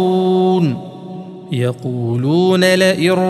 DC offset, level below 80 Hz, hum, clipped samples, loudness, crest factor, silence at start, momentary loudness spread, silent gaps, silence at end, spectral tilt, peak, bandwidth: under 0.1%; -62 dBFS; none; under 0.1%; -15 LUFS; 14 dB; 0 s; 19 LU; none; 0 s; -6 dB/octave; 0 dBFS; 13 kHz